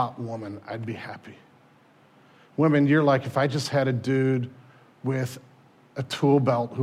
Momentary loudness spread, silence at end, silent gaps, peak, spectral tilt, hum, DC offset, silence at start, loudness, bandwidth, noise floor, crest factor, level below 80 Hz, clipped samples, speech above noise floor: 17 LU; 0 s; none; -8 dBFS; -7 dB/octave; none; under 0.1%; 0 s; -25 LUFS; 14 kHz; -57 dBFS; 16 dB; -72 dBFS; under 0.1%; 33 dB